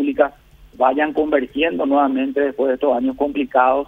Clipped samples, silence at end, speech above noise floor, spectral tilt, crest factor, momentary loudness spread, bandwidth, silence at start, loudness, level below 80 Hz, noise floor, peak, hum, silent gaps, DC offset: under 0.1%; 0.05 s; 28 dB; -7 dB/octave; 16 dB; 4 LU; 3.9 kHz; 0 s; -18 LUFS; -50 dBFS; -45 dBFS; -2 dBFS; none; none; under 0.1%